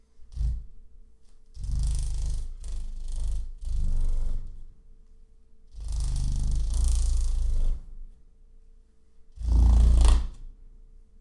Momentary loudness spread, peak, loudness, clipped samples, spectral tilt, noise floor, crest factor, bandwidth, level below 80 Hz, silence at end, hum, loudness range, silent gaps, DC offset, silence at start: 19 LU; -6 dBFS; -30 LUFS; under 0.1%; -5.5 dB/octave; -53 dBFS; 20 dB; 11 kHz; -26 dBFS; 0.35 s; none; 9 LU; none; under 0.1%; 0.15 s